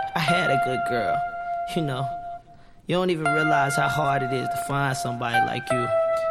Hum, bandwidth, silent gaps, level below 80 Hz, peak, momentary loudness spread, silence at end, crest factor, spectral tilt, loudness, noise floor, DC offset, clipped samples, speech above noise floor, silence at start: none; 16 kHz; none; -54 dBFS; -8 dBFS; 9 LU; 0 s; 16 dB; -5 dB/octave; -24 LUFS; -48 dBFS; under 0.1%; under 0.1%; 25 dB; 0 s